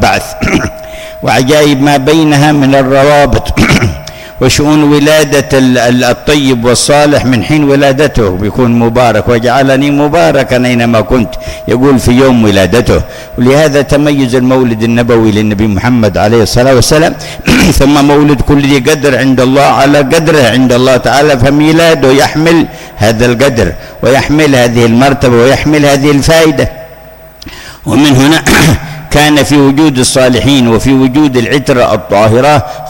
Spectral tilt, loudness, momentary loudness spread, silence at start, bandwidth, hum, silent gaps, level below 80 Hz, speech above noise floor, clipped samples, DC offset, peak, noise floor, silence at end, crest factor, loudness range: -5 dB/octave; -7 LUFS; 6 LU; 0 s; 17.5 kHz; none; none; -24 dBFS; 25 dB; 0.1%; under 0.1%; 0 dBFS; -31 dBFS; 0 s; 6 dB; 2 LU